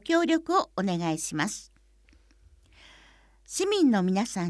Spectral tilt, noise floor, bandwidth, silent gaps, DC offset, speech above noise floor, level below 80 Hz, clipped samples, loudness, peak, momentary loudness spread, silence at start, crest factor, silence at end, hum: -4.5 dB/octave; -60 dBFS; 11 kHz; none; under 0.1%; 34 dB; -60 dBFS; under 0.1%; -26 LUFS; -10 dBFS; 8 LU; 0.05 s; 18 dB; 0 s; none